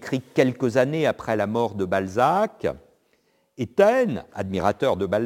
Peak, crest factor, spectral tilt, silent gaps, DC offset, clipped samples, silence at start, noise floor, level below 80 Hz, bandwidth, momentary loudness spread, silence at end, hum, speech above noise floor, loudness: -4 dBFS; 20 dB; -6.5 dB/octave; none; under 0.1%; under 0.1%; 0 s; -66 dBFS; -56 dBFS; 17 kHz; 11 LU; 0 s; none; 44 dB; -23 LUFS